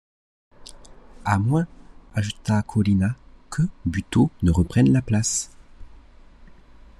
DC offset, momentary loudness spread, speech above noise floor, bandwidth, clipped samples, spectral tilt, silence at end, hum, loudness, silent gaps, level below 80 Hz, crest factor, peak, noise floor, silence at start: under 0.1%; 13 LU; 26 dB; 12.5 kHz; under 0.1%; -6 dB/octave; 0.55 s; none; -23 LUFS; none; -40 dBFS; 18 dB; -6 dBFS; -47 dBFS; 0.7 s